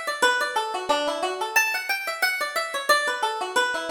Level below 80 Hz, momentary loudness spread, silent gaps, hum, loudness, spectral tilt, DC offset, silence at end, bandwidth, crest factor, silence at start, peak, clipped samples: -66 dBFS; 5 LU; none; none; -23 LUFS; 0.5 dB/octave; under 0.1%; 0 s; over 20 kHz; 18 dB; 0 s; -6 dBFS; under 0.1%